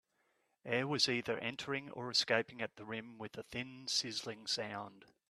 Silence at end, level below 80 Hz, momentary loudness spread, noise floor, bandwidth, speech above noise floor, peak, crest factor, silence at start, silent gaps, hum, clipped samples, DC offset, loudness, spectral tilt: 0.25 s; -76 dBFS; 14 LU; -79 dBFS; 14 kHz; 40 dB; -16 dBFS; 24 dB; 0.65 s; none; none; under 0.1%; under 0.1%; -37 LUFS; -3 dB/octave